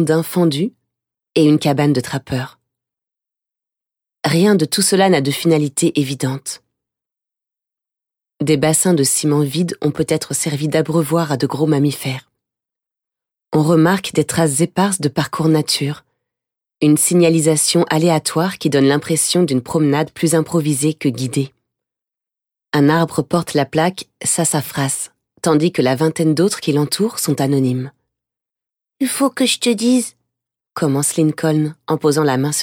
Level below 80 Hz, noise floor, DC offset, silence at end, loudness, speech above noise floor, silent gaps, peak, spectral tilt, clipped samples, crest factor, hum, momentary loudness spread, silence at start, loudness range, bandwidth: -58 dBFS; -87 dBFS; under 0.1%; 0 s; -16 LUFS; 72 dB; none; -2 dBFS; -5 dB/octave; under 0.1%; 16 dB; none; 9 LU; 0 s; 4 LU; 18 kHz